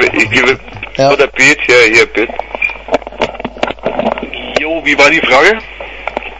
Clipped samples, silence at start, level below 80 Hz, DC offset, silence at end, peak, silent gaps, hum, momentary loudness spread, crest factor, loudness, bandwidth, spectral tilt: 0.5%; 0 s; -36 dBFS; under 0.1%; 0 s; 0 dBFS; none; none; 13 LU; 12 dB; -10 LUFS; 11 kHz; -3 dB/octave